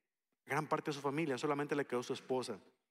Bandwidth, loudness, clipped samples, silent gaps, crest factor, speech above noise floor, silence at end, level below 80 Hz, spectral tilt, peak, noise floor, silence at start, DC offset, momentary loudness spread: 15.5 kHz; -39 LUFS; under 0.1%; none; 18 dB; 28 dB; 0.3 s; under -90 dBFS; -5.5 dB/octave; -22 dBFS; -67 dBFS; 0.45 s; under 0.1%; 4 LU